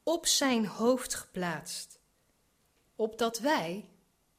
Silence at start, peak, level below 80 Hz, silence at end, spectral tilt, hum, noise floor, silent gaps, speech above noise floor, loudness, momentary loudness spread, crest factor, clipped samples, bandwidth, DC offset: 0.05 s; -14 dBFS; -66 dBFS; 0.5 s; -2.5 dB/octave; none; -72 dBFS; none; 41 dB; -31 LUFS; 14 LU; 20 dB; under 0.1%; 15.5 kHz; under 0.1%